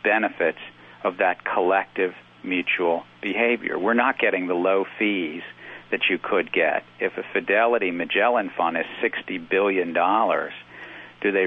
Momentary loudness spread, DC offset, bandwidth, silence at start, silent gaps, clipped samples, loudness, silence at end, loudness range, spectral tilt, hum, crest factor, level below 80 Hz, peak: 11 LU; under 0.1%; 4.1 kHz; 0.05 s; none; under 0.1%; -23 LUFS; 0 s; 2 LU; -7 dB/octave; none; 18 dB; -72 dBFS; -6 dBFS